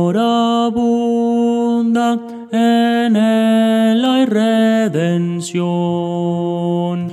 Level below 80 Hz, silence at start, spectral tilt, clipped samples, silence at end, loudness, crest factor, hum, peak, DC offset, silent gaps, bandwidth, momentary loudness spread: -60 dBFS; 0 s; -6.5 dB/octave; under 0.1%; 0 s; -15 LUFS; 12 dB; none; -4 dBFS; under 0.1%; none; 12.5 kHz; 6 LU